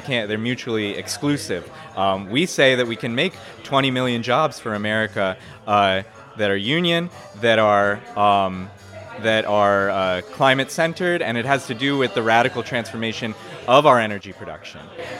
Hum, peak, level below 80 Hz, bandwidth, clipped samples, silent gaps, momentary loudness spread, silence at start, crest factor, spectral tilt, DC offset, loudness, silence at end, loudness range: none; 0 dBFS; -60 dBFS; 15.5 kHz; under 0.1%; none; 15 LU; 0 s; 20 dB; -4.5 dB/octave; under 0.1%; -20 LUFS; 0 s; 2 LU